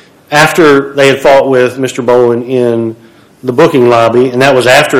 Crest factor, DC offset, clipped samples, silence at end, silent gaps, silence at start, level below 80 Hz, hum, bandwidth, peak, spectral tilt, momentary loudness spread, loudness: 8 dB; under 0.1%; 8%; 0 s; none; 0.3 s; -44 dBFS; none; 18 kHz; 0 dBFS; -5 dB/octave; 8 LU; -7 LUFS